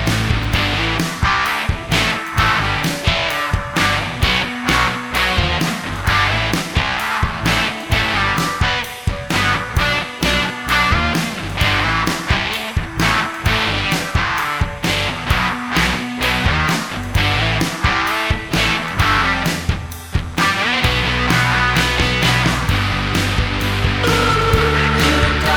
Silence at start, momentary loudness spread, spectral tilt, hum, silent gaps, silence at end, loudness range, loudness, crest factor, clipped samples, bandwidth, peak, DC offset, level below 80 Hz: 0 s; 5 LU; -4 dB/octave; none; none; 0 s; 2 LU; -17 LUFS; 16 dB; under 0.1%; over 20 kHz; 0 dBFS; under 0.1%; -26 dBFS